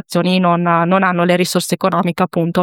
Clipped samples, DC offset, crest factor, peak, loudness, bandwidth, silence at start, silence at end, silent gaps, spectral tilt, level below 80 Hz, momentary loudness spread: under 0.1%; under 0.1%; 14 dB; 0 dBFS; -15 LUFS; 17 kHz; 0.1 s; 0 s; none; -5.5 dB/octave; -58 dBFS; 3 LU